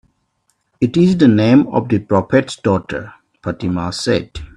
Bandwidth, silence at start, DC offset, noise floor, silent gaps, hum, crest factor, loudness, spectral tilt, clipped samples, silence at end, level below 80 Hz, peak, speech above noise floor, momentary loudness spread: 11.5 kHz; 0.8 s; under 0.1%; -66 dBFS; none; none; 16 dB; -15 LUFS; -7 dB/octave; under 0.1%; 0.1 s; -44 dBFS; 0 dBFS; 51 dB; 13 LU